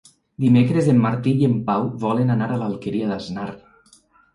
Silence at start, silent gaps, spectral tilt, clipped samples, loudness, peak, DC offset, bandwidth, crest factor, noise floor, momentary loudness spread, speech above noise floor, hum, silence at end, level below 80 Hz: 0.4 s; none; -8.5 dB/octave; under 0.1%; -20 LUFS; -6 dBFS; under 0.1%; 11 kHz; 16 dB; -55 dBFS; 11 LU; 36 dB; none; 0.75 s; -56 dBFS